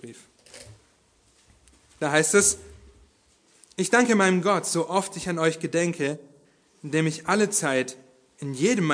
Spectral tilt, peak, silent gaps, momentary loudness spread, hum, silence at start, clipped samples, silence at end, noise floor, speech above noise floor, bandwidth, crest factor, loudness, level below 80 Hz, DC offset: -4 dB/octave; -4 dBFS; none; 15 LU; none; 0 s; under 0.1%; 0 s; -62 dBFS; 39 dB; 11 kHz; 22 dB; -23 LUFS; -60 dBFS; under 0.1%